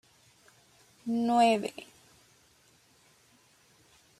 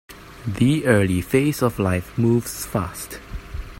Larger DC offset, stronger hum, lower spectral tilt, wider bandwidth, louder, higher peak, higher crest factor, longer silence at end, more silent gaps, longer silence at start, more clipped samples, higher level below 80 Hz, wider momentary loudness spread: neither; neither; second, -4.5 dB/octave vs -6 dB/octave; second, 14 kHz vs 16.5 kHz; second, -28 LUFS vs -21 LUFS; second, -12 dBFS vs -2 dBFS; about the same, 20 dB vs 18 dB; first, 2.35 s vs 0 s; neither; first, 1.05 s vs 0.1 s; neither; second, -78 dBFS vs -40 dBFS; first, 24 LU vs 16 LU